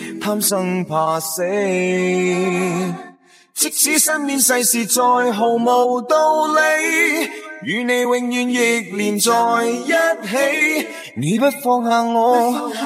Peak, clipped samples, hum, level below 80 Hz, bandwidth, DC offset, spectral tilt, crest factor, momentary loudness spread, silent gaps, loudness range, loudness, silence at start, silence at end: -2 dBFS; under 0.1%; none; -70 dBFS; 16 kHz; under 0.1%; -3 dB/octave; 16 dB; 7 LU; none; 3 LU; -17 LUFS; 0 s; 0 s